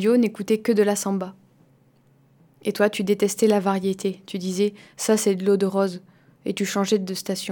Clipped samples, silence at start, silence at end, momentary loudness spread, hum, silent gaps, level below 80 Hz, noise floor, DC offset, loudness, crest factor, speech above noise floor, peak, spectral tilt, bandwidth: under 0.1%; 0 s; 0 s; 10 LU; none; none; -72 dBFS; -58 dBFS; under 0.1%; -23 LUFS; 16 dB; 36 dB; -6 dBFS; -5 dB/octave; 19 kHz